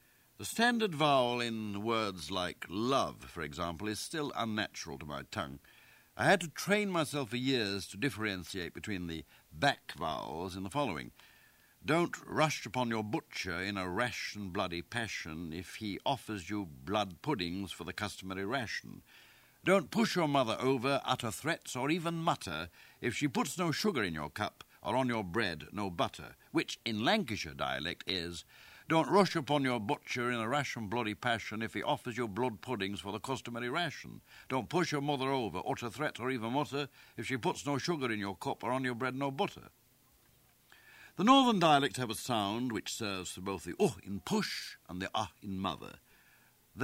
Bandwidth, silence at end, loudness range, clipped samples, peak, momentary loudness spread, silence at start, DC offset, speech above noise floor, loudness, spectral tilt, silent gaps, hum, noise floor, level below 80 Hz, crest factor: 16 kHz; 0 s; 6 LU; under 0.1%; -12 dBFS; 11 LU; 0.4 s; under 0.1%; 33 dB; -34 LUFS; -4.5 dB/octave; none; none; -67 dBFS; -64 dBFS; 24 dB